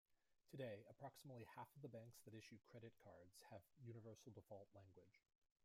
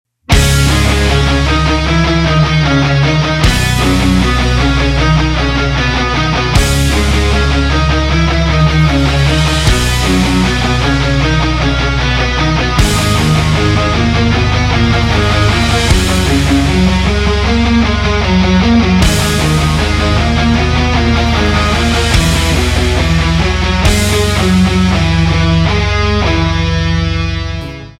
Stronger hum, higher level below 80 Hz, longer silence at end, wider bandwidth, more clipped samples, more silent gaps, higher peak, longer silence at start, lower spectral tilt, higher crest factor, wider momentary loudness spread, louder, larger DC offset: neither; second, under -90 dBFS vs -16 dBFS; first, 0.45 s vs 0.1 s; about the same, 16 kHz vs 16 kHz; neither; neither; second, -42 dBFS vs 0 dBFS; second, 0.1 s vs 0.3 s; about the same, -6 dB/octave vs -5 dB/octave; first, 20 dB vs 10 dB; first, 10 LU vs 2 LU; second, -61 LUFS vs -11 LUFS; neither